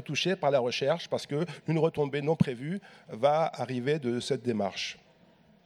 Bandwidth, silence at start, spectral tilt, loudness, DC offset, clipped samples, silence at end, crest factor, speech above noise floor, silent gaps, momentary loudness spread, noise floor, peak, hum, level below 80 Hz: 12 kHz; 0 s; -5.5 dB/octave; -30 LUFS; under 0.1%; under 0.1%; 0.7 s; 20 dB; 31 dB; none; 10 LU; -61 dBFS; -10 dBFS; none; -66 dBFS